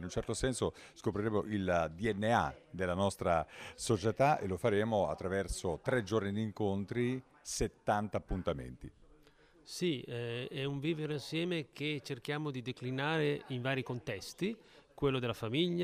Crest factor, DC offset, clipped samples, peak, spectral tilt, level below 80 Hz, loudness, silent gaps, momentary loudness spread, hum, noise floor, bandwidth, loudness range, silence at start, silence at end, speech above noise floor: 20 dB; under 0.1%; under 0.1%; -16 dBFS; -5.5 dB/octave; -54 dBFS; -36 LUFS; none; 8 LU; none; -64 dBFS; 15.5 kHz; 5 LU; 0 s; 0 s; 29 dB